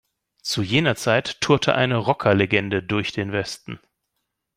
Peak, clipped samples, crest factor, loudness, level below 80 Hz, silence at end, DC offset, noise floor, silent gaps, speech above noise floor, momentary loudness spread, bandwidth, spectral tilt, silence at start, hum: -2 dBFS; under 0.1%; 20 dB; -21 LUFS; -56 dBFS; 0.8 s; under 0.1%; -78 dBFS; none; 57 dB; 13 LU; 16 kHz; -5 dB/octave; 0.45 s; none